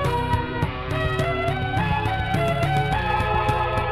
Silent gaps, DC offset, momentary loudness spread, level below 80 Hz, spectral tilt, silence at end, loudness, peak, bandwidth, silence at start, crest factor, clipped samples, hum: none; 0.2%; 3 LU; -32 dBFS; -6.5 dB/octave; 0 s; -23 LUFS; -8 dBFS; 16 kHz; 0 s; 14 dB; under 0.1%; none